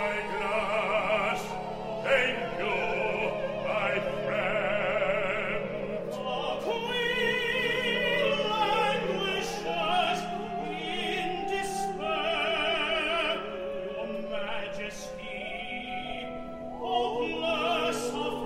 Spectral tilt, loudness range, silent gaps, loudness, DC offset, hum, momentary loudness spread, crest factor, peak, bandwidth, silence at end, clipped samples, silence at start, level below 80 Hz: -4 dB/octave; 6 LU; none; -29 LUFS; under 0.1%; none; 9 LU; 18 dB; -12 dBFS; 16 kHz; 0 s; under 0.1%; 0 s; -52 dBFS